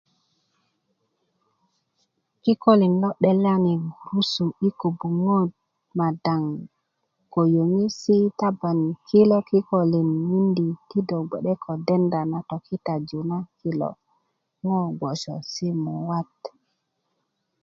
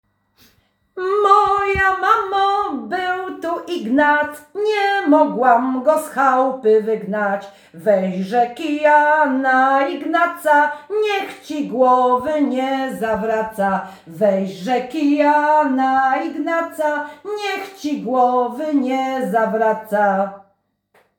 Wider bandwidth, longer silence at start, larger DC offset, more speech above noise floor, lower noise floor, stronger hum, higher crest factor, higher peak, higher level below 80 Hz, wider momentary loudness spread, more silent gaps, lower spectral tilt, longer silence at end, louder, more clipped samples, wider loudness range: second, 7.4 kHz vs over 20 kHz; first, 2.45 s vs 0.95 s; neither; first, 53 dB vs 46 dB; first, -75 dBFS vs -63 dBFS; neither; about the same, 20 dB vs 16 dB; second, -4 dBFS vs 0 dBFS; second, -66 dBFS vs -54 dBFS; about the same, 11 LU vs 10 LU; neither; first, -7.5 dB/octave vs -5.5 dB/octave; first, 1.15 s vs 0.8 s; second, -23 LUFS vs -18 LUFS; neither; first, 8 LU vs 3 LU